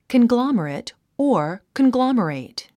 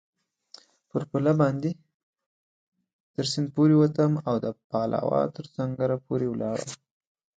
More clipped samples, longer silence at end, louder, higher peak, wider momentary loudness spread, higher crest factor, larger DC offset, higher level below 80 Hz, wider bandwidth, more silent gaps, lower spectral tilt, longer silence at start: neither; second, 0.15 s vs 0.6 s; first, -20 LUFS vs -26 LUFS; about the same, -6 dBFS vs -8 dBFS; about the same, 13 LU vs 13 LU; about the same, 14 dB vs 18 dB; neither; about the same, -62 dBFS vs -66 dBFS; first, 11 kHz vs 9.2 kHz; second, none vs 1.94-2.13 s, 2.26-2.72 s, 2.93-3.14 s, 4.64-4.70 s; about the same, -6.5 dB/octave vs -7 dB/octave; second, 0.1 s vs 0.95 s